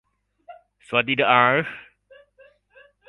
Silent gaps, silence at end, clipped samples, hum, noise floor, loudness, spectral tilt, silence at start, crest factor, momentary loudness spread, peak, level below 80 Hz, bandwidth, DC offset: none; 1.3 s; under 0.1%; 50 Hz at -60 dBFS; -56 dBFS; -19 LUFS; -6 dB/octave; 0.5 s; 24 dB; 16 LU; 0 dBFS; -66 dBFS; 11 kHz; under 0.1%